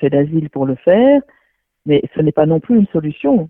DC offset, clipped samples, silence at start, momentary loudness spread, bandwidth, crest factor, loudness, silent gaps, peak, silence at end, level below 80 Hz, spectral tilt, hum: under 0.1%; under 0.1%; 0 s; 7 LU; 3.7 kHz; 14 dB; -14 LUFS; none; 0 dBFS; 0 s; -50 dBFS; -11.5 dB/octave; none